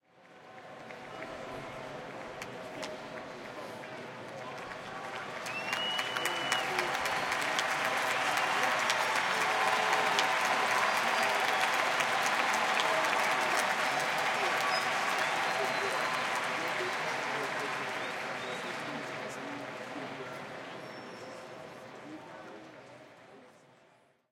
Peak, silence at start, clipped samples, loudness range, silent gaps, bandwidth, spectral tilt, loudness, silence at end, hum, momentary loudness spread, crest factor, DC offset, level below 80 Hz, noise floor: -10 dBFS; 0.25 s; under 0.1%; 15 LU; none; 17 kHz; -1.5 dB/octave; -31 LUFS; 0.8 s; none; 17 LU; 22 dB; under 0.1%; -74 dBFS; -65 dBFS